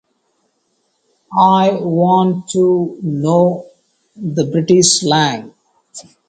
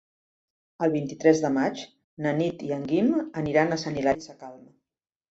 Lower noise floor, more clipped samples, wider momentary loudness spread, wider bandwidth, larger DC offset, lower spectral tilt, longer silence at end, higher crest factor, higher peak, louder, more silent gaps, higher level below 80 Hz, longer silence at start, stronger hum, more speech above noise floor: second, -65 dBFS vs -88 dBFS; neither; second, 15 LU vs 18 LU; first, 9.4 kHz vs 8 kHz; neither; second, -4.5 dB/octave vs -6 dB/octave; second, 0.3 s vs 0.75 s; second, 16 dB vs 22 dB; first, 0 dBFS vs -6 dBFS; first, -14 LUFS vs -26 LUFS; second, none vs 2.04-2.17 s; about the same, -58 dBFS vs -60 dBFS; first, 1.3 s vs 0.8 s; neither; second, 51 dB vs 63 dB